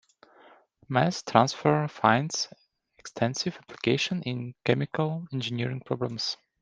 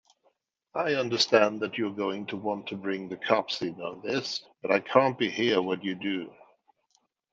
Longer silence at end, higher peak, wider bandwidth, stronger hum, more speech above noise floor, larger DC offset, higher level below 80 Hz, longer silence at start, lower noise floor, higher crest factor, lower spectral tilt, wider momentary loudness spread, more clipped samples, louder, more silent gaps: second, 0.25 s vs 1 s; about the same, -2 dBFS vs -4 dBFS; first, 10 kHz vs 7.8 kHz; neither; second, 30 dB vs 44 dB; neither; first, -66 dBFS vs -76 dBFS; first, 0.9 s vs 0.75 s; second, -57 dBFS vs -72 dBFS; about the same, 26 dB vs 24 dB; about the same, -5 dB/octave vs -4.5 dB/octave; about the same, 9 LU vs 11 LU; neither; about the same, -28 LUFS vs -28 LUFS; neither